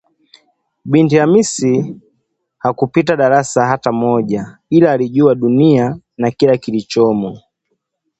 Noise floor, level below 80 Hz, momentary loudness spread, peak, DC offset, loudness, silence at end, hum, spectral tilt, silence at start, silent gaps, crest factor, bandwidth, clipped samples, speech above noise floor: -69 dBFS; -54 dBFS; 10 LU; 0 dBFS; under 0.1%; -14 LUFS; 0.8 s; none; -6.5 dB/octave; 0.85 s; none; 14 dB; 8.8 kHz; under 0.1%; 57 dB